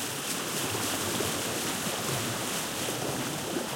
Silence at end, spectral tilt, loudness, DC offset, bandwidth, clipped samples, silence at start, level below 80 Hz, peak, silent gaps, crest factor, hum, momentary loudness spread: 0 s; -2.5 dB/octave; -30 LUFS; under 0.1%; 16.5 kHz; under 0.1%; 0 s; -62 dBFS; -16 dBFS; none; 16 dB; none; 2 LU